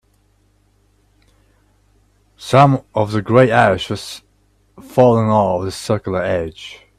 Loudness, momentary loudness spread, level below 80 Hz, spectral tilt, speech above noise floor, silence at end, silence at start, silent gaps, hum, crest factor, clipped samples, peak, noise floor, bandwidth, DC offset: -15 LUFS; 16 LU; -50 dBFS; -6.5 dB/octave; 43 dB; 0.25 s; 2.4 s; none; 50 Hz at -45 dBFS; 18 dB; under 0.1%; 0 dBFS; -58 dBFS; 14 kHz; under 0.1%